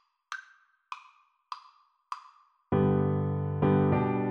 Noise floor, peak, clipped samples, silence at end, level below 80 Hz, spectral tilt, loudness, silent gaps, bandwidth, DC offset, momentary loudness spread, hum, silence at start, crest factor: -62 dBFS; -14 dBFS; under 0.1%; 0 s; -58 dBFS; -9 dB/octave; -27 LUFS; none; 6.8 kHz; under 0.1%; 20 LU; none; 0.3 s; 16 dB